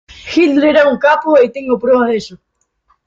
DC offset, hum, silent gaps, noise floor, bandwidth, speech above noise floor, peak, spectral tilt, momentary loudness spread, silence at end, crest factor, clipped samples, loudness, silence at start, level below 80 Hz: under 0.1%; none; none; -59 dBFS; 7.6 kHz; 48 dB; 0 dBFS; -5 dB/octave; 8 LU; 0.7 s; 12 dB; under 0.1%; -12 LUFS; 0.25 s; -52 dBFS